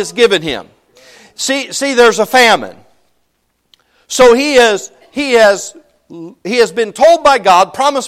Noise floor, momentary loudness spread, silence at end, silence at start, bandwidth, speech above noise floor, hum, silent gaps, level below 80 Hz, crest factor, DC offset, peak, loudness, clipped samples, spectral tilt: -63 dBFS; 16 LU; 0 s; 0 s; 16 kHz; 52 dB; none; none; -46 dBFS; 12 dB; under 0.1%; 0 dBFS; -10 LUFS; under 0.1%; -2 dB/octave